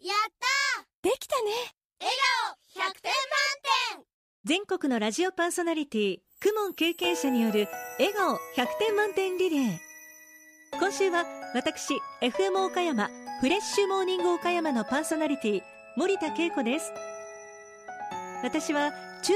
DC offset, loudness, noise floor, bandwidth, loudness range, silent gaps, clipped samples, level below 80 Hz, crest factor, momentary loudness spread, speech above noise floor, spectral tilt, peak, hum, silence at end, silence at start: under 0.1%; -28 LUFS; -54 dBFS; 15.5 kHz; 3 LU; 0.94-1.03 s, 1.84-1.90 s, 4.14-4.44 s; under 0.1%; -70 dBFS; 18 dB; 12 LU; 26 dB; -3 dB/octave; -12 dBFS; none; 0 s; 0.05 s